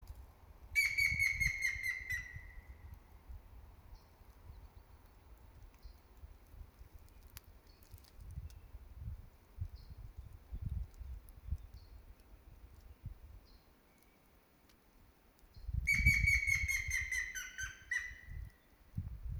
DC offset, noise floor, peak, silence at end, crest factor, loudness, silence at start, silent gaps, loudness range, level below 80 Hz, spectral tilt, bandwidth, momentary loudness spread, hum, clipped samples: under 0.1%; -67 dBFS; -16 dBFS; 0 s; 26 dB; -35 LUFS; 0 s; none; 25 LU; -50 dBFS; -2.5 dB/octave; over 20 kHz; 28 LU; none; under 0.1%